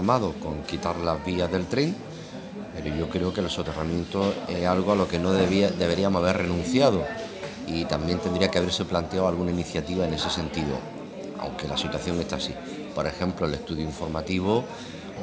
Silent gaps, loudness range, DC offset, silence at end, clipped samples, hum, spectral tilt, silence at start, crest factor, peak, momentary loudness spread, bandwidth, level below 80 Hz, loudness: none; 6 LU; under 0.1%; 0 s; under 0.1%; none; -5.5 dB/octave; 0 s; 22 dB; -4 dBFS; 12 LU; 9.6 kHz; -46 dBFS; -26 LUFS